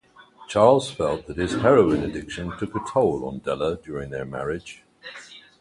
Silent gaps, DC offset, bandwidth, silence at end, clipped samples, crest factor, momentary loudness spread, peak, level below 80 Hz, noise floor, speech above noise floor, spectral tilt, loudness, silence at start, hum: none; under 0.1%; 11.5 kHz; 0.2 s; under 0.1%; 20 dB; 22 LU; -2 dBFS; -48 dBFS; -49 dBFS; 26 dB; -6 dB/octave; -23 LUFS; 0.4 s; none